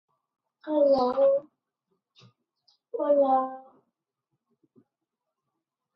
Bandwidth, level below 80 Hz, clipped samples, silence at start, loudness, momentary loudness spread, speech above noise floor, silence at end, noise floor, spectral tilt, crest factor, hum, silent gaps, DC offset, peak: 5.8 kHz; -72 dBFS; under 0.1%; 0.65 s; -25 LUFS; 17 LU; 63 dB; 2.35 s; -86 dBFS; -7.5 dB/octave; 16 dB; none; none; under 0.1%; -12 dBFS